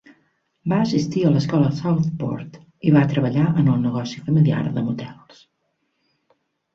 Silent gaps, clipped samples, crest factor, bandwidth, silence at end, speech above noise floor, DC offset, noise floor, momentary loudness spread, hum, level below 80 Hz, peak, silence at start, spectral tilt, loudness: none; under 0.1%; 16 dB; 7.2 kHz; 1.6 s; 52 dB; under 0.1%; -72 dBFS; 11 LU; none; -54 dBFS; -4 dBFS; 0.65 s; -8 dB/octave; -20 LUFS